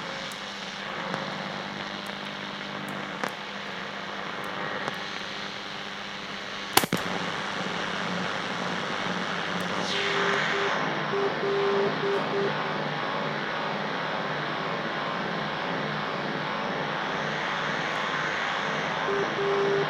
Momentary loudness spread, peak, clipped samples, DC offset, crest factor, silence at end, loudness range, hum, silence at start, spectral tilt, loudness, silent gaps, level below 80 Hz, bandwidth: 9 LU; 0 dBFS; under 0.1%; under 0.1%; 30 dB; 0 s; 7 LU; none; 0 s; -3.5 dB/octave; -29 LUFS; none; -66 dBFS; 16 kHz